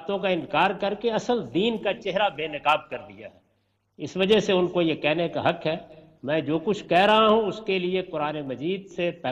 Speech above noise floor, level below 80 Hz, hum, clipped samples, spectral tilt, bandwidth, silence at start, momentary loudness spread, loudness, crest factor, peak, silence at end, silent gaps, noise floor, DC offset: 46 dB; -60 dBFS; none; under 0.1%; -5.5 dB/octave; 10.5 kHz; 0 s; 10 LU; -24 LUFS; 18 dB; -8 dBFS; 0 s; none; -70 dBFS; under 0.1%